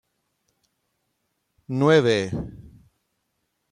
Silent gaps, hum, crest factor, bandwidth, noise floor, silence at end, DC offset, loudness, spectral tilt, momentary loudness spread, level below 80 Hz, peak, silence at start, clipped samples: none; none; 22 dB; 10 kHz; -75 dBFS; 1.05 s; under 0.1%; -21 LUFS; -6 dB/octave; 15 LU; -54 dBFS; -4 dBFS; 1.7 s; under 0.1%